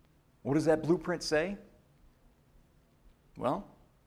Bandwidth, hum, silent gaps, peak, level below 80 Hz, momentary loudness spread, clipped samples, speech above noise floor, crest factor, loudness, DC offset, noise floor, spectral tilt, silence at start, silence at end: 14.5 kHz; none; none; -16 dBFS; -60 dBFS; 11 LU; under 0.1%; 34 dB; 20 dB; -32 LUFS; under 0.1%; -64 dBFS; -5.5 dB/octave; 0.45 s; 0.4 s